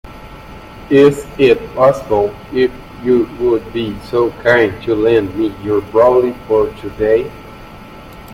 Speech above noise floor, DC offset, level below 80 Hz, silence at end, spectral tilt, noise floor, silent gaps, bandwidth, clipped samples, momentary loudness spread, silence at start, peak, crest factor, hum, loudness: 21 dB; under 0.1%; -40 dBFS; 0 s; -7 dB/octave; -34 dBFS; none; 15.5 kHz; under 0.1%; 23 LU; 0.05 s; 0 dBFS; 14 dB; none; -14 LUFS